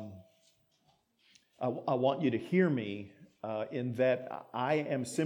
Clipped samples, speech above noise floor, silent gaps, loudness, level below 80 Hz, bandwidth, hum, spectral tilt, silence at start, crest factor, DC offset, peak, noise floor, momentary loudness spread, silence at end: under 0.1%; 40 dB; none; -33 LUFS; -82 dBFS; 19 kHz; none; -6.5 dB/octave; 0 s; 18 dB; under 0.1%; -16 dBFS; -72 dBFS; 13 LU; 0 s